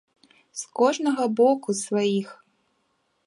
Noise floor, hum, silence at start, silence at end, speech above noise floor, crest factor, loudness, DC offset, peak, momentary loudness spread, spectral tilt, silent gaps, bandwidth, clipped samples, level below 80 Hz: -71 dBFS; none; 0.55 s; 0.95 s; 48 dB; 18 dB; -23 LUFS; under 0.1%; -6 dBFS; 16 LU; -4.5 dB/octave; none; 11.5 kHz; under 0.1%; -80 dBFS